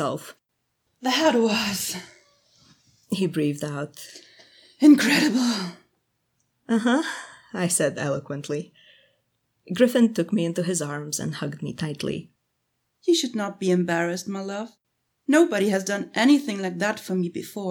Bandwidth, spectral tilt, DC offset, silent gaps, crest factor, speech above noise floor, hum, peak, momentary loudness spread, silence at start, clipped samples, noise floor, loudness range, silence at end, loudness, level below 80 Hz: 19 kHz; -4.5 dB/octave; under 0.1%; none; 20 dB; 53 dB; none; -4 dBFS; 15 LU; 0 s; under 0.1%; -76 dBFS; 5 LU; 0 s; -23 LUFS; -68 dBFS